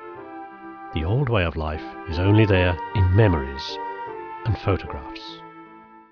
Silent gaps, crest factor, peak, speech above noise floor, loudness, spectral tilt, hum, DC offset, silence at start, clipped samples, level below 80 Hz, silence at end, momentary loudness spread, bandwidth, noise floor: none; 18 dB; -6 dBFS; 25 dB; -23 LUFS; -8 dB/octave; none; under 0.1%; 0 s; under 0.1%; -38 dBFS; 0.1 s; 20 LU; 5.4 kHz; -46 dBFS